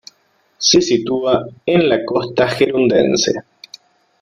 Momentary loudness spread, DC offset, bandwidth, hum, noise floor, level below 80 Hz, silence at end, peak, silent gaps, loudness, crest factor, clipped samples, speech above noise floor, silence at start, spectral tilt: 6 LU; under 0.1%; 11 kHz; none; -59 dBFS; -52 dBFS; 0.8 s; 0 dBFS; none; -15 LUFS; 16 dB; under 0.1%; 44 dB; 0.6 s; -4 dB/octave